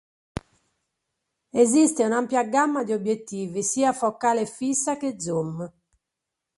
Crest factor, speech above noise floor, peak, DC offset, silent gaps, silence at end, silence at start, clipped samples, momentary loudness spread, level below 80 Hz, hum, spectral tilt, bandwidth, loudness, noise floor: 18 dB; 61 dB; -6 dBFS; under 0.1%; none; 0.9 s; 0.35 s; under 0.1%; 17 LU; -58 dBFS; none; -4.5 dB/octave; 11.5 kHz; -23 LUFS; -84 dBFS